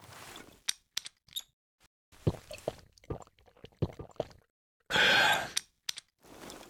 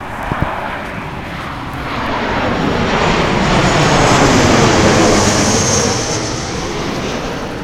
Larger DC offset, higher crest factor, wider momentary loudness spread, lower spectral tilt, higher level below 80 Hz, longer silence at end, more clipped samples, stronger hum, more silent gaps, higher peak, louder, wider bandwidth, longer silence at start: neither; first, 26 dB vs 14 dB; first, 23 LU vs 13 LU; second, -2.5 dB/octave vs -4 dB/octave; second, -58 dBFS vs -28 dBFS; about the same, 0.1 s vs 0 s; neither; neither; first, 1.53-1.78 s, 1.87-2.12 s, 4.50-4.80 s vs none; second, -8 dBFS vs 0 dBFS; second, -32 LUFS vs -14 LUFS; first, over 20 kHz vs 16.5 kHz; about the same, 0.1 s vs 0 s